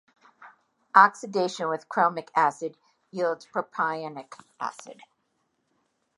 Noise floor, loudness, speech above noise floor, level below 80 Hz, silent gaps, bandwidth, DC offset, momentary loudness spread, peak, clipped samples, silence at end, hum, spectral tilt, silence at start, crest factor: -75 dBFS; -25 LUFS; 49 dB; -86 dBFS; none; 11.5 kHz; under 0.1%; 19 LU; -2 dBFS; under 0.1%; 1.25 s; none; -4.5 dB/octave; 0.4 s; 26 dB